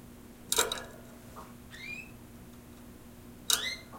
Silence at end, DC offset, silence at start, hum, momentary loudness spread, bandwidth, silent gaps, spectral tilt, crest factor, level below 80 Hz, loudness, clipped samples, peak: 0 s; under 0.1%; 0 s; 60 Hz at -55 dBFS; 22 LU; 16.5 kHz; none; -0.5 dB/octave; 30 dB; -58 dBFS; -32 LUFS; under 0.1%; -8 dBFS